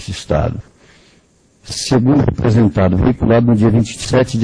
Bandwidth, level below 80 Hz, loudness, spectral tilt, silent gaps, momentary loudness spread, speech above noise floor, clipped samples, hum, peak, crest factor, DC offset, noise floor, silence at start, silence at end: 10.5 kHz; -32 dBFS; -14 LUFS; -6.5 dB/octave; none; 10 LU; 39 dB; under 0.1%; none; 0 dBFS; 14 dB; under 0.1%; -52 dBFS; 0 s; 0 s